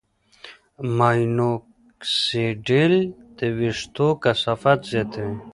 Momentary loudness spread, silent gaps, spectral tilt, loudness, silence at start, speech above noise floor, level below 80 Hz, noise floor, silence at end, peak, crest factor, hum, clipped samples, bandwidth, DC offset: 10 LU; none; -6 dB/octave; -22 LUFS; 0.45 s; 26 dB; -54 dBFS; -47 dBFS; 0.05 s; -2 dBFS; 20 dB; none; under 0.1%; 11.5 kHz; under 0.1%